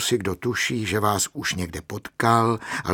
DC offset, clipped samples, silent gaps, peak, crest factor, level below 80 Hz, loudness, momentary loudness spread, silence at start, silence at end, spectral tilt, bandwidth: under 0.1%; under 0.1%; none; -4 dBFS; 20 dB; -50 dBFS; -23 LUFS; 11 LU; 0 s; 0 s; -4 dB/octave; 19 kHz